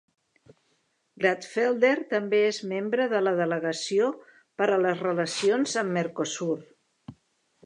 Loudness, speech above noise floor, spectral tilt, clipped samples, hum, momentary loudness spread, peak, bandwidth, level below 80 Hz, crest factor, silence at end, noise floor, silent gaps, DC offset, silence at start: -26 LUFS; 46 dB; -4.5 dB/octave; under 0.1%; none; 7 LU; -8 dBFS; 11 kHz; -76 dBFS; 20 dB; 0.5 s; -72 dBFS; none; under 0.1%; 1.2 s